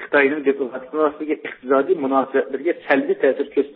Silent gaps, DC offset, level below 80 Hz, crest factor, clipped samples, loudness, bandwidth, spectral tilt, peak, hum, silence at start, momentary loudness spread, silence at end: none; under 0.1%; -70 dBFS; 18 dB; under 0.1%; -20 LUFS; 4.4 kHz; -10 dB/octave; -2 dBFS; none; 0 s; 9 LU; 0 s